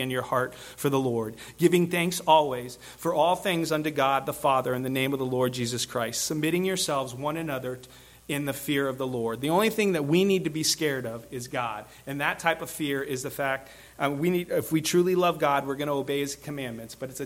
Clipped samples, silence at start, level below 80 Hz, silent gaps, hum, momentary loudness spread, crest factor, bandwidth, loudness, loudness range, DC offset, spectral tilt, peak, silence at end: under 0.1%; 0 s; -60 dBFS; none; none; 11 LU; 20 dB; 17 kHz; -27 LUFS; 4 LU; under 0.1%; -4.5 dB/octave; -6 dBFS; 0 s